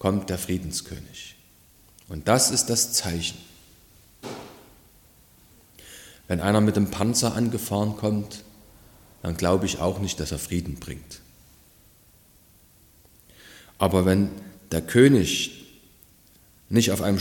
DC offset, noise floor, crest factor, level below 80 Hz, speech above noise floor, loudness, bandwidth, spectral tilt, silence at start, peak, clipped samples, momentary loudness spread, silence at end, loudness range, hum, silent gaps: under 0.1%; -56 dBFS; 22 dB; -48 dBFS; 33 dB; -23 LUFS; 17.5 kHz; -4.5 dB/octave; 0 s; -4 dBFS; under 0.1%; 23 LU; 0 s; 12 LU; none; none